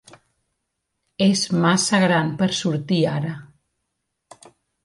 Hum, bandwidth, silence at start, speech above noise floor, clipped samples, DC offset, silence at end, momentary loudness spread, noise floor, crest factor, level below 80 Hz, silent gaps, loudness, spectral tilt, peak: none; 11.5 kHz; 1.2 s; 58 dB; under 0.1%; under 0.1%; 1.4 s; 9 LU; -77 dBFS; 16 dB; -62 dBFS; none; -20 LUFS; -4.5 dB/octave; -6 dBFS